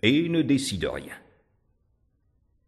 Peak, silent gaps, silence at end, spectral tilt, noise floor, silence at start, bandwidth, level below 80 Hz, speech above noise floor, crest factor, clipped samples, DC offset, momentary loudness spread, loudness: -6 dBFS; none; 1.5 s; -5 dB/octave; -69 dBFS; 0.05 s; 12.5 kHz; -54 dBFS; 44 dB; 22 dB; under 0.1%; under 0.1%; 20 LU; -25 LUFS